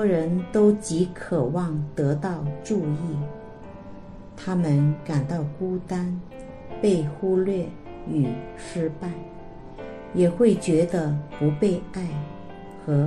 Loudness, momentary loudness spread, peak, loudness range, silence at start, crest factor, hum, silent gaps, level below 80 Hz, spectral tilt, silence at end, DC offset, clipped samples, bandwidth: -25 LUFS; 20 LU; -8 dBFS; 4 LU; 0 s; 18 dB; none; none; -48 dBFS; -8 dB/octave; 0 s; under 0.1%; under 0.1%; 11.5 kHz